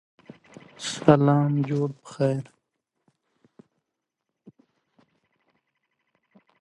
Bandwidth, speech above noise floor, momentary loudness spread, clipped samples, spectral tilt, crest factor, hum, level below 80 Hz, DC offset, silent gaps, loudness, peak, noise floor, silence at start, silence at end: 11 kHz; 61 dB; 14 LU; under 0.1%; -7 dB/octave; 26 dB; none; -64 dBFS; under 0.1%; none; -23 LUFS; -2 dBFS; -83 dBFS; 0.8 s; 4.2 s